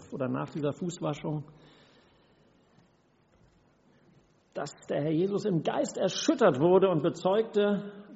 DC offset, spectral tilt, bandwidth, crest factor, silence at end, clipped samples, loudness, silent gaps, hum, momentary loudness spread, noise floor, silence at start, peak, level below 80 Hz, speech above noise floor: under 0.1%; -5.5 dB/octave; 8 kHz; 20 dB; 0 s; under 0.1%; -29 LUFS; none; none; 13 LU; -66 dBFS; 0 s; -10 dBFS; -70 dBFS; 38 dB